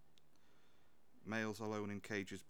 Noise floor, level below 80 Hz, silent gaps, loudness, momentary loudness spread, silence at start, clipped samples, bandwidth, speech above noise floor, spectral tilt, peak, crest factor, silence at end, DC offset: -75 dBFS; -82 dBFS; none; -44 LUFS; 3 LU; 1.15 s; under 0.1%; 19.5 kHz; 31 dB; -5 dB/octave; -26 dBFS; 20 dB; 0.05 s; 0.1%